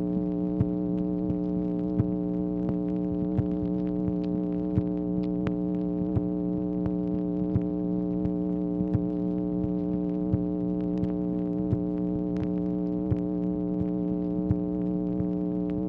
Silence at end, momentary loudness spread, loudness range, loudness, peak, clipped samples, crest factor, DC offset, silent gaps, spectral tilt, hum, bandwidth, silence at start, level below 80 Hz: 0 s; 1 LU; 0 LU; -29 LUFS; -12 dBFS; under 0.1%; 16 dB; under 0.1%; none; -12 dB/octave; none; 3.9 kHz; 0 s; -46 dBFS